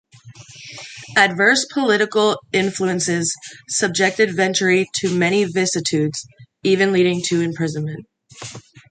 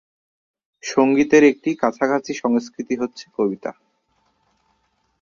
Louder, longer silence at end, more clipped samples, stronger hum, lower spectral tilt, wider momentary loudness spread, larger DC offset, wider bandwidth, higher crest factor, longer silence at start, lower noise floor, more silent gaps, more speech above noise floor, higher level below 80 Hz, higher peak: about the same, -18 LUFS vs -19 LUFS; second, 0.3 s vs 1.5 s; neither; neither; second, -3.5 dB/octave vs -5 dB/octave; first, 19 LU vs 14 LU; neither; first, 9.6 kHz vs 7.2 kHz; about the same, 18 dB vs 18 dB; second, 0.25 s vs 0.85 s; second, -43 dBFS vs -67 dBFS; neither; second, 24 dB vs 48 dB; about the same, -62 dBFS vs -62 dBFS; about the same, -2 dBFS vs -2 dBFS